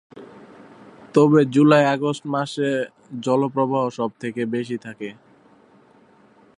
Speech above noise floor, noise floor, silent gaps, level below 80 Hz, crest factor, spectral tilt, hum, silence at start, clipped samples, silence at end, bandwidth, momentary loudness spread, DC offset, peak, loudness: 34 dB; -53 dBFS; none; -70 dBFS; 20 dB; -7 dB/octave; none; 0.15 s; under 0.1%; 1.45 s; 10.5 kHz; 15 LU; under 0.1%; -2 dBFS; -20 LUFS